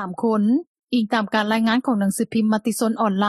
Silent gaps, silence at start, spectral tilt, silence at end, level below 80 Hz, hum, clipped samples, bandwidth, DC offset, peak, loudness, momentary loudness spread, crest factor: 0.67-0.75 s; 0 s; -5 dB/octave; 0 s; -66 dBFS; none; under 0.1%; 13.5 kHz; under 0.1%; -4 dBFS; -21 LUFS; 3 LU; 16 dB